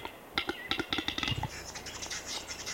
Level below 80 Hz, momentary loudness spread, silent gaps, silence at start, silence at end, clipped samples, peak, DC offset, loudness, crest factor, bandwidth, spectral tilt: -54 dBFS; 8 LU; none; 0 s; 0 s; under 0.1%; -14 dBFS; under 0.1%; -35 LUFS; 24 dB; 17 kHz; -2.5 dB/octave